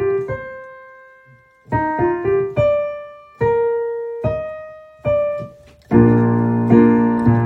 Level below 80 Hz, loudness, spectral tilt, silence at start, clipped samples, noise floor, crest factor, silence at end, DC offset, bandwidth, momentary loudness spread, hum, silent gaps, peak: -42 dBFS; -17 LUFS; -10.5 dB/octave; 0 s; under 0.1%; -49 dBFS; 18 dB; 0 s; under 0.1%; 4.2 kHz; 20 LU; none; none; 0 dBFS